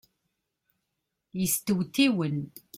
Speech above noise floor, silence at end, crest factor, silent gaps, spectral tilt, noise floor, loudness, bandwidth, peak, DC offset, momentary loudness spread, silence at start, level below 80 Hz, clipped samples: 55 dB; 0.3 s; 22 dB; none; -4.5 dB/octave; -82 dBFS; -27 LUFS; 16.5 kHz; -8 dBFS; under 0.1%; 10 LU; 1.35 s; -66 dBFS; under 0.1%